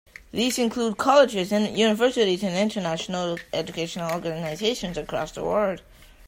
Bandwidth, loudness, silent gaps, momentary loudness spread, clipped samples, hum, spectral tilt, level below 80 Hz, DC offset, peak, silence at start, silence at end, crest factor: 16 kHz; -24 LUFS; none; 11 LU; under 0.1%; none; -4.5 dB/octave; -54 dBFS; under 0.1%; -4 dBFS; 0.35 s; 0.5 s; 20 dB